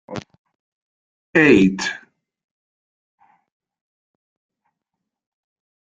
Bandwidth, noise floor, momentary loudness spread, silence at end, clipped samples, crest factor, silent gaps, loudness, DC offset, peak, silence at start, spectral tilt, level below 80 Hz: 9.2 kHz; -82 dBFS; 22 LU; 3.85 s; under 0.1%; 22 dB; 0.38-0.45 s, 0.55-1.33 s; -16 LUFS; under 0.1%; -2 dBFS; 0.1 s; -5.5 dB/octave; -58 dBFS